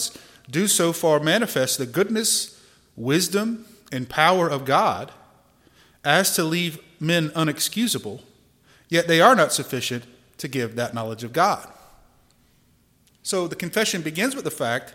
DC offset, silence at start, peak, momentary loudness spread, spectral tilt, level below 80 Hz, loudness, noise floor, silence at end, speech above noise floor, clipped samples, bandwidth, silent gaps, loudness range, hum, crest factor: under 0.1%; 0 s; 0 dBFS; 12 LU; -3.5 dB/octave; -64 dBFS; -22 LUFS; -60 dBFS; 0.05 s; 38 dB; under 0.1%; 16.5 kHz; none; 6 LU; none; 22 dB